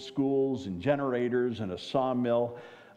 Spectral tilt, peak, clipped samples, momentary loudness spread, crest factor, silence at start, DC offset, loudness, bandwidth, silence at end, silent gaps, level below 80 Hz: -7.5 dB/octave; -14 dBFS; under 0.1%; 6 LU; 16 dB; 0 s; under 0.1%; -30 LUFS; 9.2 kHz; 0.15 s; none; -68 dBFS